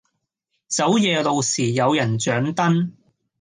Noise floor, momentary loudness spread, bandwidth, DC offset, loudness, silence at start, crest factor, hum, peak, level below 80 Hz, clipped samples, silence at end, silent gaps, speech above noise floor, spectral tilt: -76 dBFS; 5 LU; 10 kHz; under 0.1%; -20 LUFS; 0.7 s; 16 dB; none; -6 dBFS; -62 dBFS; under 0.1%; 0.5 s; none; 56 dB; -4.5 dB/octave